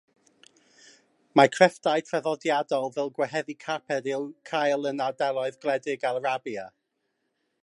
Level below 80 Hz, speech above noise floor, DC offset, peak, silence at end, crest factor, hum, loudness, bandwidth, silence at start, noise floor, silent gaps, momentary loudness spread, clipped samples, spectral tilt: -82 dBFS; 51 dB; under 0.1%; -2 dBFS; 0.95 s; 24 dB; none; -26 LUFS; 11.5 kHz; 1.35 s; -77 dBFS; none; 11 LU; under 0.1%; -4.5 dB/octave